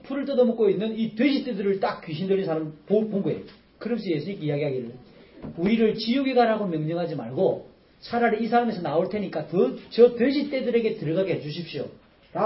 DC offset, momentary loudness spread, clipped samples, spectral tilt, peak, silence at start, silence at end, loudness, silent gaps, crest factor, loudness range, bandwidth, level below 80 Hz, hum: under 0.1%; 12 LU; under 0.1%; -11 dB/octave; -4 dBFS; 0.05 s; 0 s; -25 LUFS; none; 20 dB; 4 LU; 5.8 kHz; -62 dBFS; none